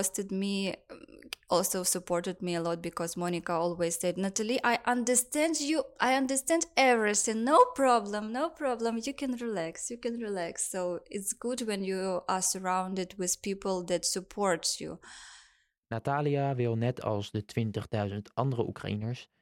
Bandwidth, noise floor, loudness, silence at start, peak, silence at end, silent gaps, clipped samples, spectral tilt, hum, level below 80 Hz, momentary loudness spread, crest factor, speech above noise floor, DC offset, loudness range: 16.5 kHz; -65 dBFS; -30 LUFS; 0 s; -10 dBFS; 0.15 s; none; under 0.1%; -4 dB/octave; none; -66 dBFS; 10 LU; 20 dB; 34 dB; under 0.1%; 7 LU